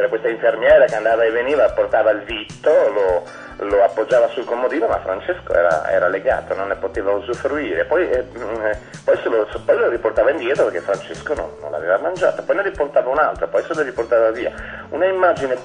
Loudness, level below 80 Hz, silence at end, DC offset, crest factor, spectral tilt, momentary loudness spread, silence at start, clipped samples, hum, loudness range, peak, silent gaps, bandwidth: -18 LUFS; -44 dBFS; 0 s; under 0.1%; 16 dB; -5.5 dB/octave; 8 LU; 0 s; under 0.1%; none; 4 LU; -2 dBFS; none; 10 kHz